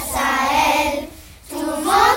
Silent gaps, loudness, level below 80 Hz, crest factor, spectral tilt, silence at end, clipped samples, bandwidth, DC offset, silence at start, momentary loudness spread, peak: none; -18 LUFS; -40 dBFS; 18 dB; -2.5 dB/octave; 0 s; under 0.1%; 16.5 kHz; under 0.1%; 0 s; 14 LU; 0 dBFS